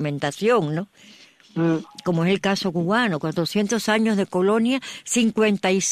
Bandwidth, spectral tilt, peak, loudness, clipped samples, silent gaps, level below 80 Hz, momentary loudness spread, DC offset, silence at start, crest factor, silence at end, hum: 14 kHz; -4.5 dB/octave; -6 dBFS; -22 LUFS; under 0.1%; none; -64 dBFS; 6 LU; under 0.1%; 0 s; 16 dB; 0 s; none